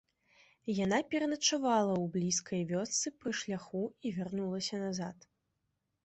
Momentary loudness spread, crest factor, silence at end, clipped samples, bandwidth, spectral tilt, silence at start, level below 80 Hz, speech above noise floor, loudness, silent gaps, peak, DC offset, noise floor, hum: 9 LU; 18 dB; 0.9 s; under 0.1%; 8.2 kHz; -4 dB/octave; 0.65 s; -72 dBFS; 49 dB; -34 LUFS; none; -16 dBFS; under 0.1%; -83 dBFS; none